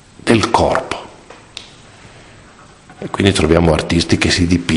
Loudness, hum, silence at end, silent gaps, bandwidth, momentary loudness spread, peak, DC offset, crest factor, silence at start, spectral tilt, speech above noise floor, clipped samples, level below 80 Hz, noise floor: -14 LUFS; none; 0 s; none; 11 kHz; 21 LU; 0 dBFS; under 0.1%; 16 dB; 0.25 s; -5 dB/octave; 28 dB; under 0.1%; -32 dBFS; -42 dBFS